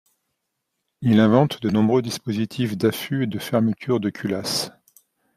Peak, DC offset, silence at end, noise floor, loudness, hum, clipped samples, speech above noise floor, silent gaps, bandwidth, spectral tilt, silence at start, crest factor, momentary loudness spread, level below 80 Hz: -2 dBFS; under 0.1%; 0.65 s; -78 dBFS; -22 LUFS; none; under 0.1%; 57 dB; none; 15.5 kHz; -6 dB/octave; 1 s; 20 dB; 9 LU; -60 dBFS